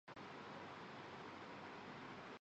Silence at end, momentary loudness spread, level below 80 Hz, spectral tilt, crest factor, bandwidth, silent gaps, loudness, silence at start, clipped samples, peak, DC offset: 0.05 s; 1 LU; -82 dBFS; -5 dB/octave; 14 dB; 8.2 kHz; none; -54 LUFS; 0.05 s; under 0.1%; -42 dBFS; under 0.1%